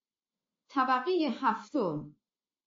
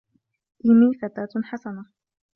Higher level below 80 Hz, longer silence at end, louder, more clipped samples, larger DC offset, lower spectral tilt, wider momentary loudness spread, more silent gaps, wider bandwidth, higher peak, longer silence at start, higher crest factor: second, -82 dBFS vs -66 dBFS; about the same, 0.55 s vs 0.5 s; second, -31 LUFS vs -21 LUFS; neither; neither; second, -3.5 dB/octave vs -9.5 dB/octave; second, 10 LU vs 19 LU; neither; first, 7.4 kHz vs 4.2 kHz; second, -16 dBFS vs -8 dBFS; about the same, 0.7 s vs 0.65 s; about the same, 18 dB vs 16 dB